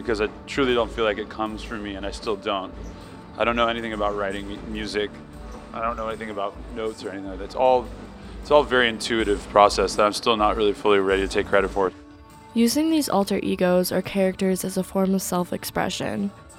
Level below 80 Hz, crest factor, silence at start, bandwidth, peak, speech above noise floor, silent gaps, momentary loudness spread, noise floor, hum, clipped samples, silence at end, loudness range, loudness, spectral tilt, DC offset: -42 dBFS; 22 dB; 0 s; 17 kHz; -2 dBFS; 22 dB; none; 13 LU; -45 dBFS; none; under 0.1%; 0 s; 7 LU; -23 LUFS; -4.5 dB/octave; under 0.1%